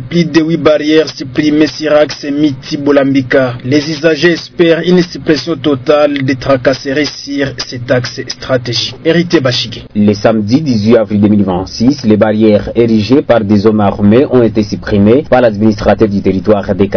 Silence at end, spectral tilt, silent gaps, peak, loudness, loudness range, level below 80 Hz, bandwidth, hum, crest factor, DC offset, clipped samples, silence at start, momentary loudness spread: 0 s; -6.5 dB/octave; none; 0 dBFS; -10 LUFS; 4 LU; -36 dBFS; 5.4 kHz; none; 10 dB; 0.2%; 2%; 0 s; 6 LU